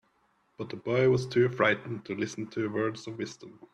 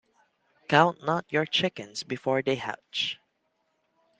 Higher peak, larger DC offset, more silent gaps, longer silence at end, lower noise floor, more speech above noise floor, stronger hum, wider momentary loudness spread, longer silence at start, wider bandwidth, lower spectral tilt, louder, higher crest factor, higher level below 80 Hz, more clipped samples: second, -10 dBFS vs -4 dBFS; neither; neither; second, 0.2 s vs 1.05 s; second, -70 dBFS vs -75 dBFS; second, 41 dB vs 48 dB; neither; about the same, 15 LU vs 13 LU; about the same, 0.6 s vs 0.7 s; about the same, 9.6 kHz vs 9.8 kHz; first, -6 dB/octave vs -4.5 dB/octave; about the same, -29 LUFS vs -27 LUFS; second, 20 dB vs 26 dB; first, -66 dBFS vs -72 dBFS; neither